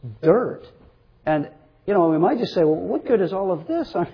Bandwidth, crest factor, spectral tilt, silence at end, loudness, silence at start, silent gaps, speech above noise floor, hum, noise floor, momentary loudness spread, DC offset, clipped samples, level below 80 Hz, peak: 5.4 kHz; 16 dB; -9 dB/octave; 0 s; -21 LUFS; 0 s; none; 30 dB; none; -51 dBFS; 11 LU; under 0.1%; under 0.1%; -56 dBFS; -6 dBFS